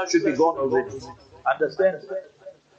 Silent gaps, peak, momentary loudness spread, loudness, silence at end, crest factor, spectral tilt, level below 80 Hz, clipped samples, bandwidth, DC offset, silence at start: none; -8 dBFS; 14 LU; -23 LUFS; 0.25 s; 16 dB; -4.5 dB/octave; -62 dBFS; under 0.1%; 8 kHz; under 0.1%; 0 s